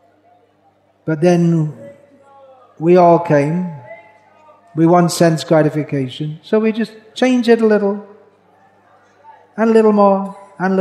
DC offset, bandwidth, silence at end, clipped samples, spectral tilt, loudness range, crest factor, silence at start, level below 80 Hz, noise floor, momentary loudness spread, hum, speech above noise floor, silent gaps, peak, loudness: under 0.1%; 13.5 kHz; 0 s; under 0.1%; -7 dB/octave; 3 LU; 16 dB; 1.05 s; -70 dBFS; -55 dBFS; 15 LU; 50 Hz at -45 dBFS; 42 dB; none; 0 dBFS; -14 LUFS